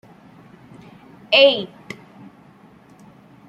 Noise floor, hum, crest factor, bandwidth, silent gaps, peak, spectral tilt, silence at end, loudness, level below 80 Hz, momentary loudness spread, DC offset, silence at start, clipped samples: -48 dBFS; none; 22 dB; 7.8 kHz; none; -2 dBFS; -4 dB/octave; 1.85 s; -15 LUFS; -68 dBFS; 25 LU; under 0.1%; 1.3 s; under 0.1%